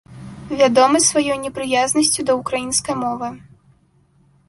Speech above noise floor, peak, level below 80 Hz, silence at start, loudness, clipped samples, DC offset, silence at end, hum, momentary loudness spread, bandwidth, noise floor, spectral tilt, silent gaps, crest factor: 39 dB; -2 dBFS; -52 dBFS; 0.1 s; -17 LUFS; under 0.1%; under 0.1%; 1.1 s; none; 15 LU; 12 kHz; -57 dBFS; -2.5 dB/octave; none; 16 dB